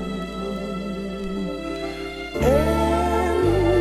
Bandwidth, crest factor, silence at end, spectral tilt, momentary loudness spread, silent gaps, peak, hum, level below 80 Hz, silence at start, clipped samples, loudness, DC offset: 14.5 kHz; 16 dB; 0 s; -6.5 dB/octave; 10 LU; none; -6 dBFS; none; -32 dBFS; 0 s; under 0.1%; -23 LUFS; under 0.1%